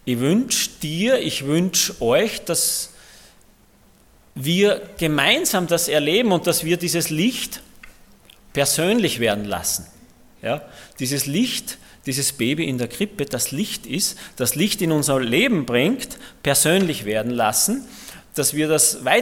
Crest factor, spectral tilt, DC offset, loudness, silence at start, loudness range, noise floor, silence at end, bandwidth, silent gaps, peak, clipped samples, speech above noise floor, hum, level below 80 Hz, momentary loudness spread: 20 dB; -3.5 dB/octave; under 0.1%; -20 LUFS; 0.05 s; 4 LU; -54 dBFS; 0 s; 17.5 kHz; none; -2 dBFS; under 0.1%; 33 dB; none; -52 dBFS; 11 LU